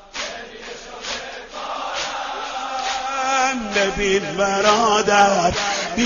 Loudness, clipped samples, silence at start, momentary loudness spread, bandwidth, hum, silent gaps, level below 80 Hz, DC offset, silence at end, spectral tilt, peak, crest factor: -20 LUFS; under 0.1%; 0 s; 16 LU; 7.6 kHz; none; none; -44 dBFS; under 0.1%; 0 s; -2.5 dB/octave; -2 dBFS; 18 dB